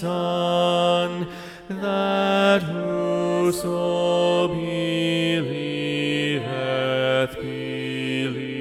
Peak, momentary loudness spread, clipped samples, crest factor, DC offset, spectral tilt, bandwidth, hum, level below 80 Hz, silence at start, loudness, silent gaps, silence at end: -6 dBFS; 8 LU; under 0.1%; 16 dB; under 0.1%; -5.5 dB/octave; 15.5 kHz; none; -56 dBFS; 0 s; -22 LUFS; none; 0 s